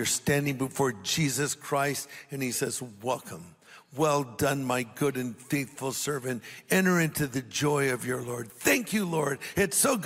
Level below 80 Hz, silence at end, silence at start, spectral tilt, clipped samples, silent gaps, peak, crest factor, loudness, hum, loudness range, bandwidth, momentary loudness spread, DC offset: -62 dBFS; 0 s; 0 s; -4 dB/octave; under 0.1%; none; -8 dBFS; 20 dB; -28 LUFS; none; 3 LU; 16 kHz; 10 LU; under 0.1%